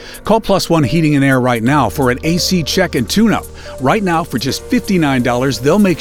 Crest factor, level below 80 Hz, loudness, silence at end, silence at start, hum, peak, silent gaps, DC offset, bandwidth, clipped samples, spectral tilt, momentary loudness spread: 14 dB; -34 dBFS; -14 LUFS; 0 s; 0 s; none; 0 dBFS; none; under 0.1%; 18.5 kHz; under 0.1%; -5.5 dB/octave; 5 LU